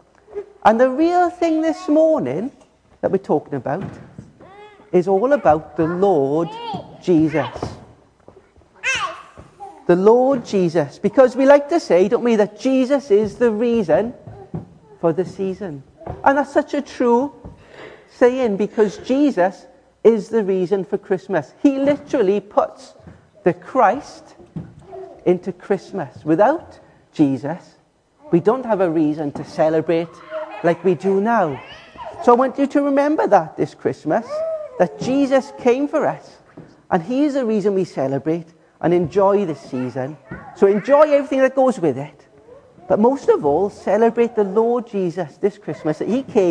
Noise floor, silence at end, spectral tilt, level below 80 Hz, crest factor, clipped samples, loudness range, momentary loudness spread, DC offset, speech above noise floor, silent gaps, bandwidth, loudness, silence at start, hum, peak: -55 dBFS; 0 s; -7 dB/octave; -54 dBFS; 18 dB; under 0.1%; 5 LU; 14 LU; under 0.1%; 38 dB; none; 10 kHz; -18 LUFS; 0.35 s; none; 0 dBFS